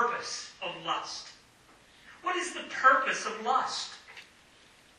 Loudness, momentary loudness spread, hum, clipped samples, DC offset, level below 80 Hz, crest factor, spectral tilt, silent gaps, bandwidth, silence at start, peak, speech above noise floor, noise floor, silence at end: -30 LUFS; 21 LU; none; under 0.1%; under 0.1%; -74 dBFS; 22 dB; -1 dB/octave; none; 12 kHz; 0 s; -10 dBFS; 30 dB; -59 dBFS; 0.75 s